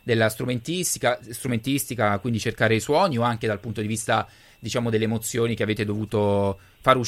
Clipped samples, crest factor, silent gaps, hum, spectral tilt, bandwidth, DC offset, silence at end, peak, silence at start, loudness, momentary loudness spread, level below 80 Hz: under 0.1%; 20 dB; none; none; -5 dB/octave; 16.5 kHz; under 0.1%; 0 s; -2 dBFS; 0.05 s; -24 LUFS; 7 LU; -54 dBFS